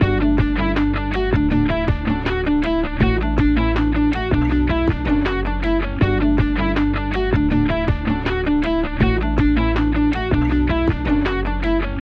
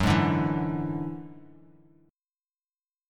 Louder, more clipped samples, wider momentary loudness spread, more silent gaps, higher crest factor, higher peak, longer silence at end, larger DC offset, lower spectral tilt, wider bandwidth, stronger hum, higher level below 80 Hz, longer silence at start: first, -19 LUFS vs -28 LUFS; neither; second, 3 LU vs 18 LU; neither; second, 14 dB vs 20 dB; first, -2 dBFS vs -10 dBFS; second, 0.1 s vs 1.65 s; neither; first, -8.5 dB/octave vs -7 dB/octave; second, 6.2 kHz vs 15 kHz; neither; first, -24 dBFS vs -48 dBFS; about the same, 0 s vs 0 s